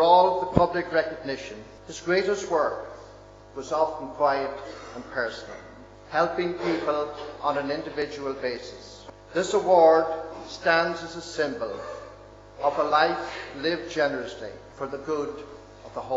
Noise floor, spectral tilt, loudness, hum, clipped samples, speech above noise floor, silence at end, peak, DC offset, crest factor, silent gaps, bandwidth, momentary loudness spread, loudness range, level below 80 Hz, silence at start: -47 dBFS; -5 dB/octave; -26 LUFS; none; under 0.1%; 21 dB; 0 s; 0 dBFS; under 0.1%; 26 dB; none; 8 kHz; 19 LU; 5 LU; -54 dBFS; 0 s